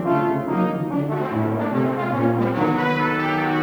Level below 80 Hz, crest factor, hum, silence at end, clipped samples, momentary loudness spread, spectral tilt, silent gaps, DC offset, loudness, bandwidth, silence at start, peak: -56 dBFS; 14 dB; none; 0 s; under 0.1%; 3 LU; -8.5 dB/octave; none; under 0.1%; -21 LUFS; over 20 kHz; 0 s; -6 dBFS